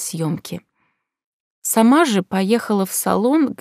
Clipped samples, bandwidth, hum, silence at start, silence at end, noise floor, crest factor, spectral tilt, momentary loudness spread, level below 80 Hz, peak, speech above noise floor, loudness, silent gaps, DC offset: under 0.1%; 16 kHz; none; 0 s; 0.05 s; -69 dBFS; 16 dB; -4.5 dB/octave; 14 LU; -64 dBFS; -2 dBFS; 51 dB; -18 LUFS; 1.24-1.62 s; under 0.1%